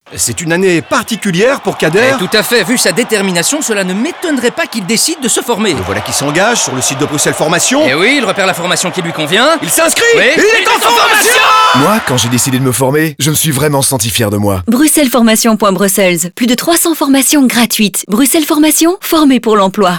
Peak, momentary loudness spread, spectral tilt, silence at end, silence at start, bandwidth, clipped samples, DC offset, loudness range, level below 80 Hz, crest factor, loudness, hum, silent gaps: 0 dBFS; 6 LU; -3 dB/octave; 0 s; 0.1 s; over 20 kHz; under 0.1%; under 0.1%; 4 LU; -48 dBFS; 10 dB; -9 LUFS; none; none